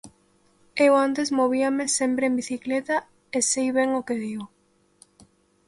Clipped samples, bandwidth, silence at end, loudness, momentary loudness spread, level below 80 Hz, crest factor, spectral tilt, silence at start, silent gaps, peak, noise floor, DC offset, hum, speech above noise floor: under 0.1%; 11.5 kHz; 1.2 s; -23 LUFS; 11 LU; -68 dBFS; 18 dB; -2.5 dB/octave; 0.05 s; none; -6 dBFS; -62 dBFS; under 0.1%; none; 39 dB